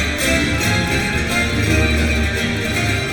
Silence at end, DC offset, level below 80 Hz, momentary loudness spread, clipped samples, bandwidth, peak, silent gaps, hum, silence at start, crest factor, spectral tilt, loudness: 0 s; under 0.1%; -26 dBFS; 3 LU; under 0.1%; 19.5 kHz; -4 dBFS; none; none; 0 s; 14 dB; -4.5 dB/octave; -17 LUFS